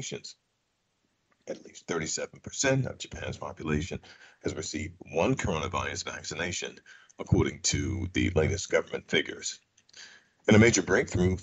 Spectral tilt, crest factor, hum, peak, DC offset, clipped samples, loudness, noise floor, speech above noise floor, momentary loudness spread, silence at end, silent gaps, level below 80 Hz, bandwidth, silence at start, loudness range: -4.5 dB/octave; 22 dB; none; -8 dBFS; under 0.1%; under 0.1%; -29 LUFS; -77 dBFS; 48 dB; 17 LU; 0 s; none; -50 dBFS; 8.4 kHz; 0 s; 6 LU